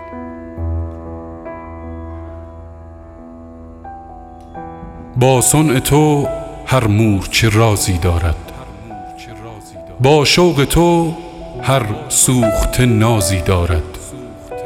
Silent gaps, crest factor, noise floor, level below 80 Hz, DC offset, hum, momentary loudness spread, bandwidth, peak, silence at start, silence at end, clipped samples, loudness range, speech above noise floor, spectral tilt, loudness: none; 16 dB; -35 dBFS; -30 dBFS; under 0.1%; none; 22 LU; 17 kHz; 0 dBFS; 0 s; 0 s; under 0.1%; 18 LU; 22 dB; -4.5 dB/octave; -14 LUFS